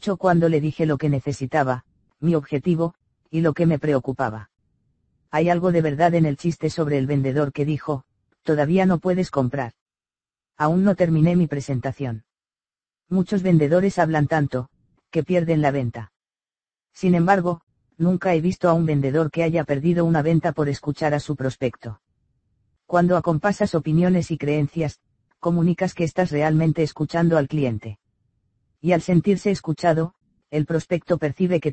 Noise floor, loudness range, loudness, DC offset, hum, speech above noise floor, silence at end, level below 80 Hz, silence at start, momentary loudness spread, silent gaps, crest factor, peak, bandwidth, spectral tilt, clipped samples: under -90 dBFS; 3 LU; -21 LUFS; under 0.1%; none; over 70 dB; 0 s; -52 dBFS; 0 s; 9 LU; 9.81-9.86 s, 17.63-17.67 s; 18 dB; -4 dBFS; 8.6 kHz; -8 dB/octave; under 0.1%